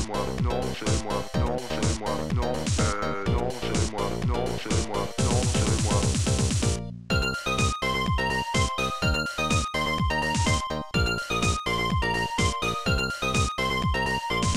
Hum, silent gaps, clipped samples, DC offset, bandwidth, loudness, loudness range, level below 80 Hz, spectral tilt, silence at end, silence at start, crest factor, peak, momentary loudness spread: none; none; under 0.1%; 0.6%; 16 kHz; -26 LUFS; 2 LU; -34 dBFS; -4.5 dB/octave; 0 s; 0 s; 14 dB; -10 dBFS; 4 LU